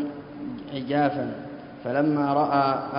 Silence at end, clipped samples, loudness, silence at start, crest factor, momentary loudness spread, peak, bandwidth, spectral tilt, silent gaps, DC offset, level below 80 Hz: 0 s; under 0.1%; -25 LUFS; 0 s; 16 dB; 15 LU; -8 dBFS; 5.4 kHz; -11 dB/octave; none; under 0.1%; -62 dBFS